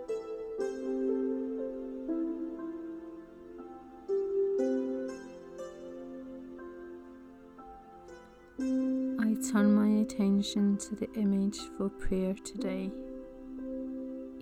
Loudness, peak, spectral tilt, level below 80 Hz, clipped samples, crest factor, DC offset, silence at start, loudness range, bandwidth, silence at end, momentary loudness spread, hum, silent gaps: -33 LUFS; -16 dBFS; -6.5 dB/octave; -54 dBFS; under 0.1%; 16 dB; under 0.1%; 0 s; 11 LU; 14.5 kHz; 0 s; 20 LU; none; none